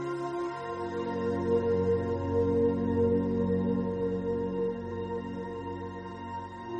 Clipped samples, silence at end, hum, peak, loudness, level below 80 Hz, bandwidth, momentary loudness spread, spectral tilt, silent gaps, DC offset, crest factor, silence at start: under 0.1%; 0 s; none; -16 dBFS; -31 LUFS; -56 dBFS; 8.4 kHz; 12 LU; -9 dB/octave; none; under 0.1%; 14 dB; 0 s